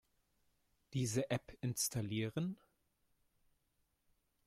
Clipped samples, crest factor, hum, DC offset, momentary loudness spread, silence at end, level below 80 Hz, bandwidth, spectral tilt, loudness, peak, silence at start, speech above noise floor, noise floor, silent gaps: under 0.1%; 20 dB; none; under 0.1%; 7 LU; 1.9 s; -70 dBFS; 16 kHz; -4.5 dB/octave; -40 LUFS; -24 dBFS; 0.9 s; 42 dB; -82 dBFS; none